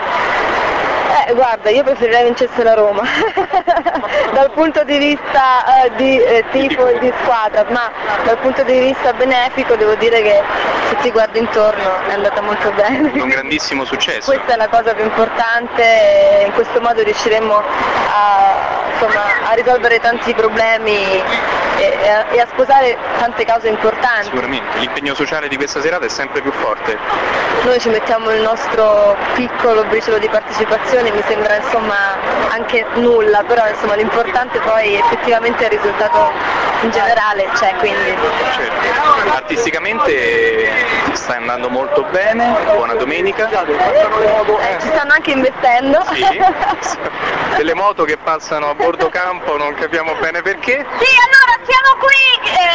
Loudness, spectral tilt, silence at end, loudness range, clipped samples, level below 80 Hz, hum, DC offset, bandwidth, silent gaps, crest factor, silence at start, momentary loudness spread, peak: -13 LUFS; -3.5 dB/octave; 0 s; 3 LU; under 0.1%; -44 dBFS; none; 0.3%; 8 kHz; none; 12 dB; 0 s; 6 LU; 0 dBFS